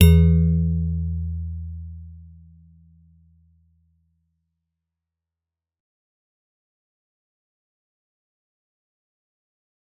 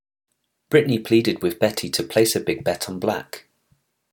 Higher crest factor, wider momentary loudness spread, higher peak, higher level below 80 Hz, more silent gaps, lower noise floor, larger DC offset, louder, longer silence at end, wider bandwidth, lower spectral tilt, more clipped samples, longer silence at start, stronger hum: about the same, 24 dB vs 20 dB; first, 23 LU vs 7 LU; first, 0 dBFS vs -4 dBFS; first, -36 dBFS vs -62 dBFS; neither; first, -88 dBFS vs -66 dBFS; neither; about the same, -21 LUFS vs -21 LUFS; first, 7.8 s vs 0.75 s; second, 4.6 kHz vs 19 kHz; first, -8.5 dB/octave vs -4.5 dB/octave; neither; second, 0 s vs 0.7 s; neither